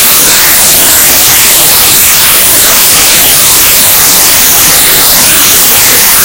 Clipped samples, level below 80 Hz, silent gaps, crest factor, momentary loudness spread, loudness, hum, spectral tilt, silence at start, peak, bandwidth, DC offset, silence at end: 20%; -30 dBFS; none; 4 dB; 0 LU; -1 LUFS; none; 0.5 dB/octave; 0 s; 0 dBFS; over 20 kHz; under 0.1%; 0 s